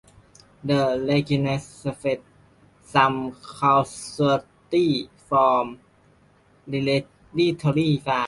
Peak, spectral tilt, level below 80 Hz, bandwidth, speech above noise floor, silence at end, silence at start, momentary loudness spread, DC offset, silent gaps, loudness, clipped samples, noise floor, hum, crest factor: -4 dBFS; -6.5 dB/octave; -58 dBFS; 11.5 kHz; 36 dB; 0 s; 0.65 s; 11 LU; under 0.1%; none; -23 LUFS; under 0.1%; -58 dBFS; 50 Hz at -50 dBFS; 20 dB